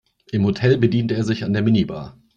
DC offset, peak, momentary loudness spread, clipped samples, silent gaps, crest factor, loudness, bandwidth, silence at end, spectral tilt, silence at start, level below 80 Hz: under 0.1%; -4 dBFS; 10 LU; under 0.1%; none; 16 dB; -20 LUFS; 7.6 kHz; 0.25 s; -8 dB/octave; 0.3 s; -50 dBFS